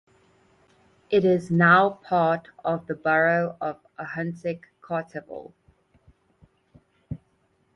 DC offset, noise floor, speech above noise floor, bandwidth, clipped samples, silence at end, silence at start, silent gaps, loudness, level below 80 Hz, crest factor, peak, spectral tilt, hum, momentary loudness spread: under 0.1%; -67 dBFS; 44 dB; 9.4 kHz; under 0.1%; 0.6 s; 1.1 s; none; -23 LUFS; -62 dBFS; 20 dB; -6 dBFS; -8 dB/octave; none; 22 LU